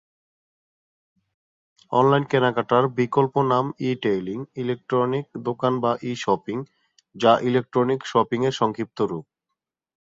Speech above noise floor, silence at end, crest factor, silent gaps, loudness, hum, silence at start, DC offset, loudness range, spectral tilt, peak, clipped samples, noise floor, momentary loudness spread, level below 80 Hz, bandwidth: 61 dB; 0.85 s; 20 dB; none; -23 LUFS; none; 1.9 s; under 0.1%; 3 LU; -6.5 dB/octave; -2 dBFS; under 0.1%; -83 dBFS; 10 LU; -64 dBFS; 7.8 kHz